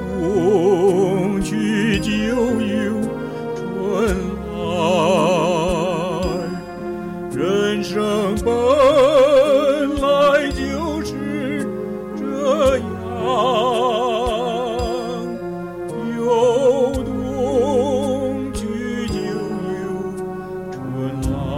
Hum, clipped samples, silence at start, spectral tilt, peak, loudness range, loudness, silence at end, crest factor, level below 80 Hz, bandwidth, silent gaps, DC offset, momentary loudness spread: none; under 0.1%; 0 s; -6 dB/octave; -4 dBFS; 5 LU; -19 LUFS; 0 s; 14 dB; -38 dBFS; 16 kHz; none; 0.1%; 12 LU